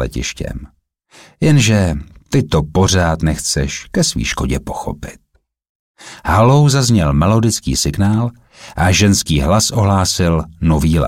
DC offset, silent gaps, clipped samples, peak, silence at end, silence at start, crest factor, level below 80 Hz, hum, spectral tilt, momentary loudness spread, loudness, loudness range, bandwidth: under 0.1%; 5.69-5.95 s; under 0.1%; -2 dBFS; 0 s; 0 s; 12 dB; -28 dBFS; none; -5 dB/octave; 14 LU; -14 LUFS; 4 LU; 16.5 kHz